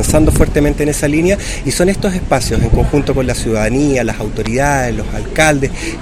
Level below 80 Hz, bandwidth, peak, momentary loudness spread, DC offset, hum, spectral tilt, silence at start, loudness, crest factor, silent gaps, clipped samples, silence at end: -20 dBFS; 16 kHz; 0 dBFS; 6 LU; under 0.1%; none; -5.5 dB/octave; 0 s; -14 LUFS; 12 dB; none; 0.2%; 0 s